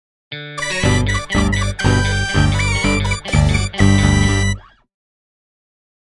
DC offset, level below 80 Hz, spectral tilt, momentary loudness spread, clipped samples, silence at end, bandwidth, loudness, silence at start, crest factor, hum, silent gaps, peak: under 0.1%; -26 dBFS; -5 dB/octave; 9 LU; under 0.1%; 1.5 s; 11.5 kHz; -16 LUFS; 0.3 s; 16 dB; 50 Hz at -30 dBFS; none; 0 dBFS